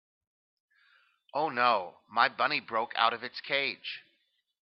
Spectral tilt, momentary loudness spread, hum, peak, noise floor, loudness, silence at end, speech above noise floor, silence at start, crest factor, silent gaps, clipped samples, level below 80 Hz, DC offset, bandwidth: -6 dB/octave; 12 LU; none; -8 dBFS; -75 dBFS; -29 LUFS; 0.65 s; 45 dB; 1.35 s; 24 dB; none; under 0.1%; -84 dBFS; under 0.1%; 6 kHz